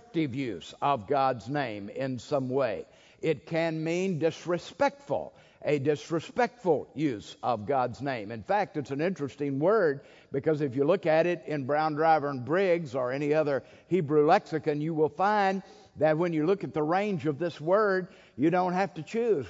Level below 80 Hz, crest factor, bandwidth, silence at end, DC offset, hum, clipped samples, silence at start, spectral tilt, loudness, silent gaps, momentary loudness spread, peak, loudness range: -70 dBFS; 18 dB; 7.8 kHz; 0 s; under 0.1%; none; under 0.1%; 0.15 s; -7 dB/octave; -29 LUFS; none; 9 LU; -10 dBFS; 4 LU